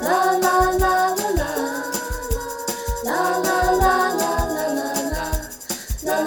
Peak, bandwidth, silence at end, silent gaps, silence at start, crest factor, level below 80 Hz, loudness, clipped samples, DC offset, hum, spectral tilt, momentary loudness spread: -6 dBFS; over 20 kHz; 0 s; none; 0 s; 16 dB; -32 dBFS; -21 LUFS; under 0.1%; under 0.1%; none; -4 dB/octave; 9 LU